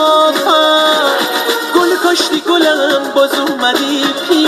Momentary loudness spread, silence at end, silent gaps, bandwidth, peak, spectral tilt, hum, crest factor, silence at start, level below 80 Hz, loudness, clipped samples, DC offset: 4 LU; 0 s; none; 14 kHz; 0 dBFS; -1.5 dB/octave; none; 12 dB; 0 s; -62 dBFS; -11 LUFS; under 0.1%; under 0.1%